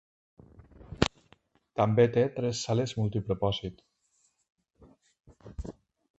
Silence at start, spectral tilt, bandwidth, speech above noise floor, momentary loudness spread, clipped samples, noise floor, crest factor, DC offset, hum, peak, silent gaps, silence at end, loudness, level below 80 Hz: 0.8 s; -6 dB/octave; 8.2 kHz; 44 dB; 19 LU; under 0.1%; -72 dBFS; 30 dB; under 0.1%; none; -2 dBFS; 4.52-4.56 s; 0.45 s; -29 LUFS; -50 dBFS